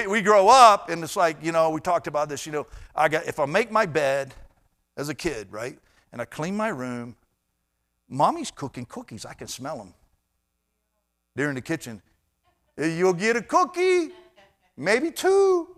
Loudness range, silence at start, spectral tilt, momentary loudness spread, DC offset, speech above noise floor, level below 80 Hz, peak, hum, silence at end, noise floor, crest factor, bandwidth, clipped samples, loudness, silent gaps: 12 LU; 0 s; -4 dB/octave; 18 LU; under 0.1%; 53 dB; -58 dBFS; 0 dBFS; none; 0.05 s; -76 dBFS; 24 dB; 15 kHz; under 0.1%; -22 LUFS; none